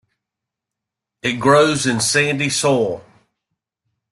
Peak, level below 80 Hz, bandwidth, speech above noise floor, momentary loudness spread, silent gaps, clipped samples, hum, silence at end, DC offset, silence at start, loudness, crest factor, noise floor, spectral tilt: -2 dBFS; -56 dBFS; 12.5 kHz; 67 dB; 10 LU; none; under 0.1%; none; 1.1 s; under 0.1%; 1.25 s; -16 LUFS; 18 dB; -84 dBFS; -3.5 dB/octave